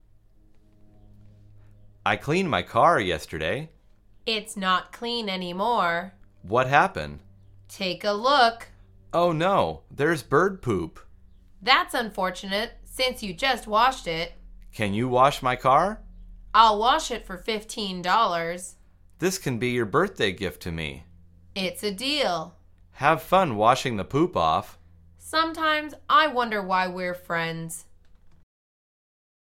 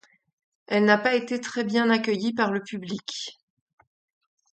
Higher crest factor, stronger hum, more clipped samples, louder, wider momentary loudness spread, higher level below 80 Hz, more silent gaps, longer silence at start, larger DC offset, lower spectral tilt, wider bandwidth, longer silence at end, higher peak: about the same, 24 dB vs 22 dB; neither; neither; about the same, -24 LUFS vs -25 LUFS; about the same, 12 LU vs 13 LU; first, -50 dBFS vs -74 dBFS; neither; first, 2.05 s vs 0.7 s; neither; about the same, -4.5 dB/octave vs -4.5 dB/octave; first, 16.5 kHz vs 8.8 kHz; about the same, 1.15 s vs 1.2 s; about the same, -2 dBFS vs -4 dBFS